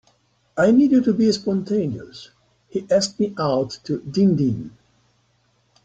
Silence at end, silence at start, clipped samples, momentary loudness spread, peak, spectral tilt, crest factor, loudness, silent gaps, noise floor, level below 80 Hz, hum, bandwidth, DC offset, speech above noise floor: 1.15 s; 0.55 s; under 0.1%; 16 LU; -6 dBFS; -6.5 dB/octave; 16 dB; -20 LUFS; none; -64 dBFS; -58 dBFS; none; 9.2 kHz; under 0.1%; 44 dB